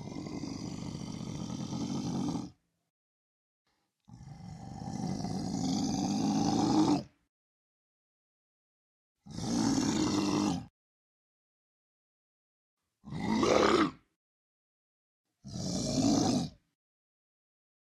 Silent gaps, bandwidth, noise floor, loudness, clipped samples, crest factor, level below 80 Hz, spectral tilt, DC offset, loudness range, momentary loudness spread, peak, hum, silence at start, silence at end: 2.90-3.65 s, 7.29-9.15 s, 10.70-12.77 s, 14.16-15.24 s; 13 kHz; -59 dBFS; -32 LUFS; under 0.1%; 26 dB; -60 dBFS; -5 dB/octave; under 0.1%; 8 LU; 16 LU; -10 dBFS; none; 0 s; 1.3 s